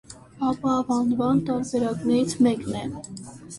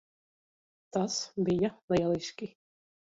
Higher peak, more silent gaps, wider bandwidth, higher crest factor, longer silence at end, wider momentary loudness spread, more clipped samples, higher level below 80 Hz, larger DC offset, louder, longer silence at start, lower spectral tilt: first, -10 dBFS vs -16 dBFS; second, none vs 1.83-1.88 s; first, 11.5 kHz vs 7.8 kHz; about the same, 14 dB vs 18 dB; second, 0 s vs 0.65 s; about the same, 12 LU vs 12 LU; neither; first, -54 dBFS vs -62 dBFS; neither; first, -24 LUFS vs -31 LUFS; second, 0.1 s vs 0.95 s; about the same, -6 dB/octave vs -5 dB/octave